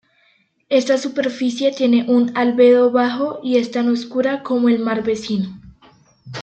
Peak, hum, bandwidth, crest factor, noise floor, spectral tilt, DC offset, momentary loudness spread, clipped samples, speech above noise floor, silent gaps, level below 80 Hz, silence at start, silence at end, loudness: -2 dBFS; none; 8.4 kHz; 16 dB; -60 dBFS; -5.5 dB/octave; under 0.1%; 9 LU; under 0.1%; 43 dB; none; -60 dBFS; 0.7 s; 0 s; -17 LUFS